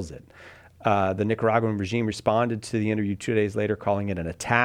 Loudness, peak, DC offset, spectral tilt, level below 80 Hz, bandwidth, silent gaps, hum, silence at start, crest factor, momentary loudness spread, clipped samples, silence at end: -25 LUFS; -4 dBFS; under 0.1%; -6 dB/octave; -54 dBFS; 13.5 kHz; none; none; 0 s; 22 dB; 7 LU; under 0.1%; 0 s